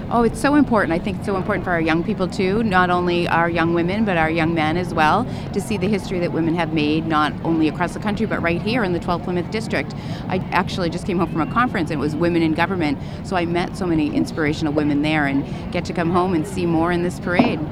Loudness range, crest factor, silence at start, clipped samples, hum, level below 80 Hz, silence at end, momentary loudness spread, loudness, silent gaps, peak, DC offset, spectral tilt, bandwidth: 3 LU; 20 dB; 0 s; under 0.1%; none; -40 dBFS; 0 s; 6 LU; -20 LUFS; none; 0 dBFS; under 0.1%; -6.5 dB/octave; 13.5 kHz